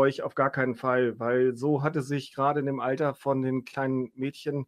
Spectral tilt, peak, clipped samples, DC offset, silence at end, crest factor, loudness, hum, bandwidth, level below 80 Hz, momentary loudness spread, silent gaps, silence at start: -7.5 dB/octave; -10 dBFS; under 0.1%; under 0.1%; 0.05 s; 18 dB; -28 LUFS; none; 13 kHz; -72 dBFS; 5 LU; none; 0 s